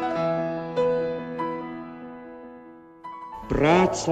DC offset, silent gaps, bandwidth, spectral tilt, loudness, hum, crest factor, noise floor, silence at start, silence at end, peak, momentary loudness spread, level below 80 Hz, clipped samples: under 0.1%; none; 9.2 kHz; -5.5 dB/octave; -25 LUFS; none; 20 dB; -46 dBFS; 0 s; 0 s; -6 dBFS; 22 LU; -46 dBFS; under 0.1%